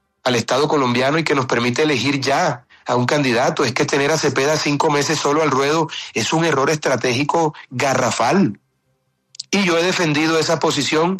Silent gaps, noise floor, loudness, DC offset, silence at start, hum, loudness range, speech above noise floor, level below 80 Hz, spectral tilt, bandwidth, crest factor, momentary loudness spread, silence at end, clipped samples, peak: none; -67 dBFS; -17 LUFS; under 0.1%; 0.25 s; none; 2 LU; 50 dB; -58 dBFS; -4 dB/octave; 13.5 kHz; 12 dB; 4 LU; 0 s; under 0.1%; -6 dBFS